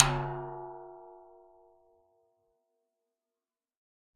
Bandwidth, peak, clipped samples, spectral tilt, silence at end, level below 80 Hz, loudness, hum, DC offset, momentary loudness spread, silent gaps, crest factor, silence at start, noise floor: 9 kHz; 0 dBFS; under 0.1%; -5 dB/octave; 2.9 s; -52 dBFS; -33 LUFS; none; under 0.1%; 23 LU; none; 36 dB; 0 s; under -90 dBFS